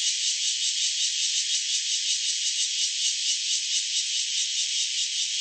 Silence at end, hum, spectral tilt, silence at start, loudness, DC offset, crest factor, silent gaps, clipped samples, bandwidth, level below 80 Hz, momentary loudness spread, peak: 0 s; none; 15 dB/octave; 0 s; -23 LUFS; under 0.1%; 14 dB; none; under 0.1%; 8.8 kHz; under -90 dBFS; 1 LU; -12 dBFS